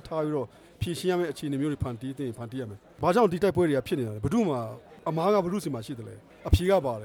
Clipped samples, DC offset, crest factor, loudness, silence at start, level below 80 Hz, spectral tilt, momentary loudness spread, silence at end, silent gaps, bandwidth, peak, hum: under 0.1%; under 0.1%; 22 dB; -28 LUFS; 0.05 s; -42 dBFS; -7 dB/octave; 15 LU; 0 s; none; 19 kHz; -6 dBFS; none